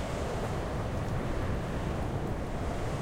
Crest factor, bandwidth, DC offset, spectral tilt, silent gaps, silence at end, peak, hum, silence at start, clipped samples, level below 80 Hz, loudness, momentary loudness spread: 14 dB; 16 kHz; under 0.1%; -6.5 dB/octave; none; 0 s; -18 dBFS; none; 0 s; under 0.1%; -38 dBFS; -34 LUFS; 1 LU